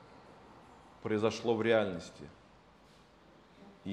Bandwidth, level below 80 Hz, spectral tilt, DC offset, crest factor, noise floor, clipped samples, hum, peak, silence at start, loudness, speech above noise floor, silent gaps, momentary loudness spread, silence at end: 10 kHz; -70 dBFS; -5.5 dB/octave; under 0.1%; 22 dB; -61 dBFS; under 0.1%; none; -14 dBFS; 0.1 s; -33 LUFS; 29 dB; none; 27 LU; 0 s